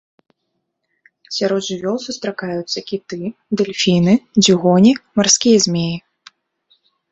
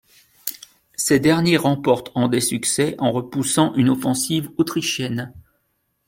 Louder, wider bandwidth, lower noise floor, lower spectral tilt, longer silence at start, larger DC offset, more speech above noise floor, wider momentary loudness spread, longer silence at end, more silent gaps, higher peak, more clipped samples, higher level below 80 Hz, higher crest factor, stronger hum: first, -16 LUFS vs -20 LUFS; second, 8.2 kHz vs 16.5 kHz; about the same, -73 dBFS vs -70 dBFS; about the same, -4 dB/octave vs -4.5 dB/octave; first, 1.3 s vs 0.45 s; neither; first, 57 dB vs 51 dB; about the same, 13 LU vs 14 LU; first, 1.1 s vs 0.65 s; neither; about the same, 0 dBFS vs -2 dBFS; neither; about the same, -56 dBFS vs -56 dBFS; about the same, 16 dB vs 18 dB; neither